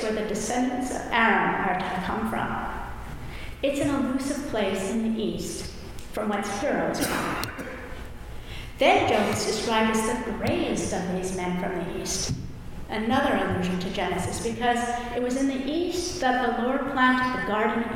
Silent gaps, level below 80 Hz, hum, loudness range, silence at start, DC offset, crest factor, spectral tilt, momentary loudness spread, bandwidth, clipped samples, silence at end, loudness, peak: none; -44 dBFS; none; 4 LU; 0 s; under 0.1%; 18 dB; -4.5 dB/octave; 15 LU; 18.5 kHz; under 0.1%; 0 s; -26 LUFS; -8 dBFS